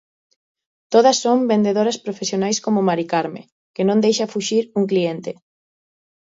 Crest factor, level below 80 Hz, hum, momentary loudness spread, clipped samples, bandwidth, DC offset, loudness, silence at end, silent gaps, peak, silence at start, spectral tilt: 18 dB; -68 dBFS; none; 15 LU; under 0.1%; 7.8 kHz; under 0.1%; -19 LUFS; 1.05 s; 3.52-3.74 s; -2 dBFS; 0.9 s; -4.5 dB/octave